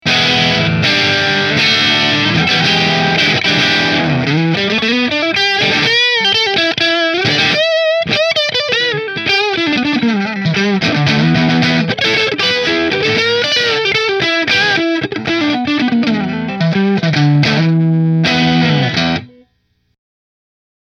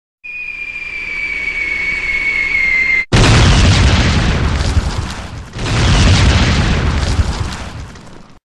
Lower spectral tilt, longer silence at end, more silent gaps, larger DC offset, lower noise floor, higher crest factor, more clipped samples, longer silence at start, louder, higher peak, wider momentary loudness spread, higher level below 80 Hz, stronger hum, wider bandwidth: about the same, -4.5 dB/octave vs -4.5 dB/octave; first, 1.6 s vs 0.2 s; neither; second, under 0.1% vs 0.5%; first, -61 dBFS vs -35 dBFS; about the same, 14 dB vs 12 dB; neither; second, 0.05 s vs 0.25 s; about the same, -12 LUFS vs -13 LUFS; about the same, 0 dBFS vs -2 dBFS; second, 4 LU vs 15 LU; second, -46 dBFS vs -18 dBFS; neither; second, 9.2 kHz vs 11 kHz